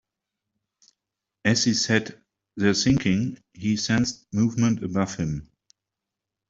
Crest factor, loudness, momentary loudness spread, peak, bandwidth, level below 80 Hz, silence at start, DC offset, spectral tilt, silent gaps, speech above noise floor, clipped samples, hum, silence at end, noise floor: 20 dB; -24 LUFS; 10 LU; -4 dBFS; 8 kHz; -52 dBFS; 1.45 s; under 0.1%; -4.5 dB/octave; none; 63 dB; under 0.1%; none; 1.05 s; -86 dBFS